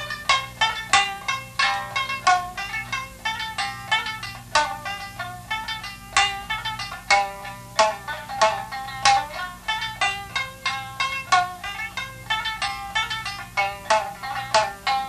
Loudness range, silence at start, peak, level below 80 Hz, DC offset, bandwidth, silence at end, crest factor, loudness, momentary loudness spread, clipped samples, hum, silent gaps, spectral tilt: 3 LU; 0 s; -2 dBFS; -50 dBFS; under 0.1%; 14 kHz; 0 s; 22 dB; -24 LUFS; 10 LU; under 0.1%; 60 Hz at -55 dBFS; none; -1 dB/octave